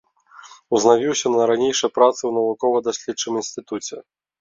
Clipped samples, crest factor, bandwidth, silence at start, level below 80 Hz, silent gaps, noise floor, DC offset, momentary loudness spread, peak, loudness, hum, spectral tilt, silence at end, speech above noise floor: under 0.1%; 18 dB; 7.8 kHz; 0.45 s; -66 dBFS; none; -46 dBFS; under 0.1%; 13 LU; -2 dBFS; -20 LUFS; none; -3 dB/octave; 0.4 s; 27 dB